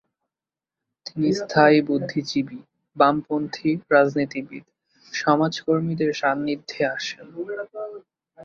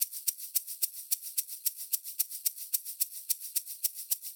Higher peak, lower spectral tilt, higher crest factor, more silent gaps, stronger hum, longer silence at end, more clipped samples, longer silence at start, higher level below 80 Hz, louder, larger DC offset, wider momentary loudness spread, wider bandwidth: first, -2 dBFS vs -14 dBFS; first, -6 dB/octave vs 11.5 dB/octave; about the same, 22 dB vs 22 dB; neither; neither; about the same, 0 s vs 0 s; neither; first, 1.05 s vs 0 s; first, -66 dBFS vs under -90 dBFS; first, -22 LUFS vs -32 LUFS; neither; first, 16 LU vs 3 LU; second, 7.2 kHz vs over 20 kHz